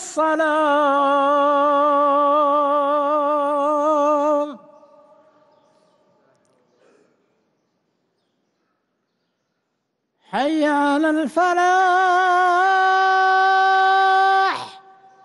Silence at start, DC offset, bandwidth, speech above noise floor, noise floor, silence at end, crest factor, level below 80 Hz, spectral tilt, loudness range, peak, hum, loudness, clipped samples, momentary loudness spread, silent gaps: 0 s; under 0.1%; 11.5 kHz; 57 dB; -74 dBFS; 0.45 s; 10 dB; -72 dBFS; -3 dB/octave; 10 LU; -8 dBFS; none; -17 LUFS; under 0.1%; 5 LU; none